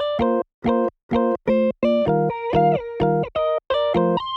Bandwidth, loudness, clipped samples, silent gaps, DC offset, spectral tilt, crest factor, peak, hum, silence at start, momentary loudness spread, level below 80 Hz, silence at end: 6.4 kHz; -21 LUFS; under 0.1%; 0.54-0.62 s, 1.03-1.09 s; under 0.1%; -8.5 dB/octave; 14 dB; -6 dBFS; none; 0 s; 4 LU; -46 dBFS; 0 s